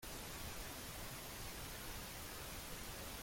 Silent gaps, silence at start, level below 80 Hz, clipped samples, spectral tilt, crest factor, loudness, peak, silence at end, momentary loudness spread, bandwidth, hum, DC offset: none; 0 s; -56 dBFS; under 0.1%; -2.5 dB/octave; 12 dB; -48 LUFS; -36 dBFS; 0 s; 1 LU; 16.5 kHz; none; under 0.1%